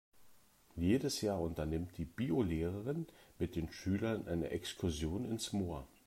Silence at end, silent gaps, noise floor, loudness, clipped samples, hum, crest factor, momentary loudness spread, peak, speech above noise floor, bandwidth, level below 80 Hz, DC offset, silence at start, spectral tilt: 0.2 s; none; -65 dBFS; -39 LUFS; under 0.1%; none; 16 dB; 8 LU; -22 dBFS; 27 dB; 16 kHz; -56 dBFS; under 0.1%; 0.15 s; -6 dB/octave